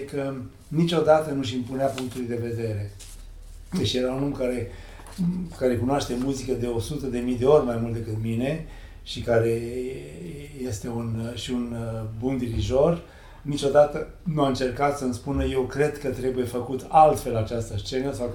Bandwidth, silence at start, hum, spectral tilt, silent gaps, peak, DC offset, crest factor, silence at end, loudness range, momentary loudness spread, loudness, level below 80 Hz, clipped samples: 18 kHz; 0 s; none; -6.5 dB/octave; none; -4 dBFS; under 0.1%; 22 dB; 0 s; 5 LU; 14 LU; -25 LUFS; -42 dBFS; under 0.1%